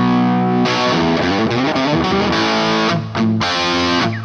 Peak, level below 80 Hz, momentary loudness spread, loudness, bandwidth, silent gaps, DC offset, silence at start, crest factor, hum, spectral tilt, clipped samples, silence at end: -2 dBFS; -44 dBFS; 2 LU; -15 LUFS; 8.6 kHz; none; under 0.1%; 0 s; 12 dB; none; -5.5 dB/octave; under 0.1%; 0 s